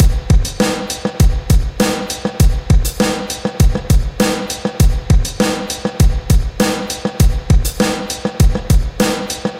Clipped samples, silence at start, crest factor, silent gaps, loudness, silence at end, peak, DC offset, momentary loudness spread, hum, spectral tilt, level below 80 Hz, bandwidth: under 0.1%; 0 s; 14 dB; none; -16 LUFS; 0 s; 0 dBFS; under 0.1%; 7 LU; none; -5 dB/octave; -16 dBFS; 16.5 kHz